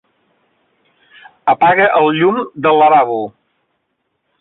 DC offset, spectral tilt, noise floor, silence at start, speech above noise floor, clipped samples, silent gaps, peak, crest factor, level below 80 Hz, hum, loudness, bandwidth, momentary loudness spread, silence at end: under 0.1%; -9.5 dB/octave; -69 dBFS; 1.45 s; 57 dB; under 0.1%; none; -2 dBFS; 14 dB; -60 dBFS; none; -12 LUFS; 4.1 kHz; 11 LU; 1.1 s